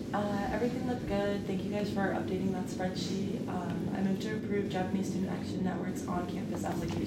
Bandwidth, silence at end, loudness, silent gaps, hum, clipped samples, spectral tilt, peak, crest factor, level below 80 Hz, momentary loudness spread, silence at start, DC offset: 15.5 kHz; 0 s; -34 LUFS; none; none; under 0.1%; -6.5 dB/octave; -18 dBFS; 14 dB; -54 dBFS; 3 LU; 0 s; under 0.1%